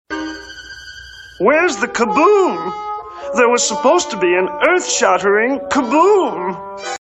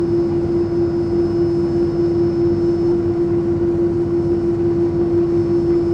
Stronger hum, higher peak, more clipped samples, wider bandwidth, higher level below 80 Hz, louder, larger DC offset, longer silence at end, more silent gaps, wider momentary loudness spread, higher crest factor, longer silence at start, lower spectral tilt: neither; first, 0 dBFS vs -8 dBFS; neither; first, 8.6 kHz vs 5.8 kHz; second, -52 dBFS vs -36 dBFS; about the same, -15 LUFS vs -17 LUFS; neither; about the same, 0.05 s vs 0 s; neither; first, 19 LU vs 1 LU; first, 16 dB vs 8 dB; about the same, 0.1 s vs 0 s; second, -2.5 dB/octave vs -10 dB/octave